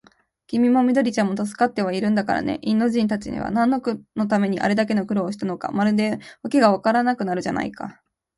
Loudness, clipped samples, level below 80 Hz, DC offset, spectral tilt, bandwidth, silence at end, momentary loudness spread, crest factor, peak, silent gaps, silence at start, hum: -21 LUFS; under 0.1%; -56 dBFS; under 0.1%; -6.5 dB/octave; 11.5 kHz; 0.45 s; 9 LU; 18 dB; -4 dBFS; none; 0.5 s; none